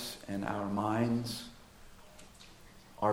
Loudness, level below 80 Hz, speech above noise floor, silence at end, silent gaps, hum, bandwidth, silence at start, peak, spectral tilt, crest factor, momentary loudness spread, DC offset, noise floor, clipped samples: -35 LUFS; -60 dBFS; 22 dB; 0 s; none; none; 16.5 kHz; 0 s; -16 dBFS; -5.5 dB/octave; 20 dB; 25 LU; under 0.1%; -55 dBFS; under 0.1%